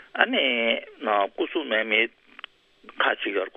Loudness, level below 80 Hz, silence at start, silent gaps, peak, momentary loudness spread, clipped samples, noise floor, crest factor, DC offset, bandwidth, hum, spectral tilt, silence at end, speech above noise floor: -24 LUFS; -74 dBFS; 0.15 s; none; 0 dBFS; 22 LU; under 0.1%; -47 dBFS; 26 dB; under 0.1%; 5 kHz; none; -5.5 dB/octave; 0.05 s; 22 dB